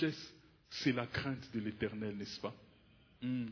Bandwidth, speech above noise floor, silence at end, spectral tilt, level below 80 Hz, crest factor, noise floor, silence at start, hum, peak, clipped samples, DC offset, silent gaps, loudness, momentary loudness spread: 5.4 kHz; 27 dB; 0 s; -4.5 dB/octave; -66 dBFS; 20 dB; -66 dBFS; 0 s; none; -20 dBFS; under 0.1%; under 0.1%; none; -40 LUFS; 11 LU